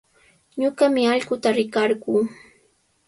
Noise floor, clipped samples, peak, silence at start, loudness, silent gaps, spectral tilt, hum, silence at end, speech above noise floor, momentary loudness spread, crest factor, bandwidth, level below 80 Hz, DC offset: -63 dBFS; under 0.1%; -6 dBFS; 0.55 s; -21 LUFS; none; -4.5 dB/octave; none; 0.75 s; 43 dB; 7 LU; 16 dB; 11.5 kHz; -66 dBFS; under 0.1%